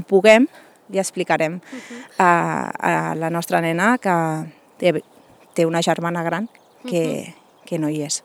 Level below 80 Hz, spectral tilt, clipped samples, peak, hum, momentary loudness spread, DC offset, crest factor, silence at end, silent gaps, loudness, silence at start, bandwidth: -72 dBFS; -5 dB/octave; under 0.1%; 0 dBFS; none; 15 LU; under 0.1%; 20 dB; 0.05 s; none; -20 LUFS; 0 s; 17.5 kHz